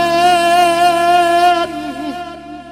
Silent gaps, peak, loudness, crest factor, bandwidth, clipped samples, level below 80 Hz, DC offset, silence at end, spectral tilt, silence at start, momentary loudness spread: none; -4 dBFS; -12 LUFS; 10 dB; 16 kHz; under 0.1%; -46 dBFS; under 0.1%; 0 s; -3 dB/octave; 0 s; 16 LU